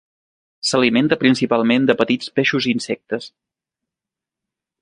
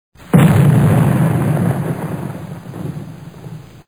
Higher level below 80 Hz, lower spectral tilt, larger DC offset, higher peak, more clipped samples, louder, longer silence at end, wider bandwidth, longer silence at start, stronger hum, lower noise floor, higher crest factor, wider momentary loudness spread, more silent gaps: second, -60 dBFS vs -42 dBFS; second, -4.5 dB/octave vs -8 dB/octave; second, under 0.1% vs 0.2%; about the same, -2 dBFS vs 0 dBFS; neither; second, -18 LUFS vs -14 LUFS; first, 1.55 s vs 0.25 s; second, 10.5 kHz vs over 20 kHz; first, 0.65 s vs 0.3 s; neither; first, -87 dBFS vs -33 dBFS; about the same, 18 dB vs 14 dB; second, 9 LU vs 22 LU; neither